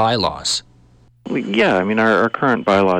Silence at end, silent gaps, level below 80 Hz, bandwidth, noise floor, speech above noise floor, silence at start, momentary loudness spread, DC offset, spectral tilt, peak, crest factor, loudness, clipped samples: 0 s; none; -50 dBFS; 12.5 kHz; -50 dBFS; 34 dB; 0 s; 7 LU; under 0.1%; -4.5 dB/octave; -4 dBFS; 12 dB; -17 LUFS; under 0.1%